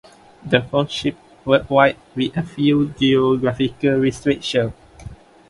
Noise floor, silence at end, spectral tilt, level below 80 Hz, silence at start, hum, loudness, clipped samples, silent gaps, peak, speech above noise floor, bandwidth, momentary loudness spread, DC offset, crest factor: -39 dBFS; 0.35 s; -6.5 dB/octave; -48 dBFS; 0.45 s; none; -19 LUFS; under 0.1%; none; 0 dBFS; 21 dB; 11.5 kHz; 9 LU; under 0.1%; 18 dB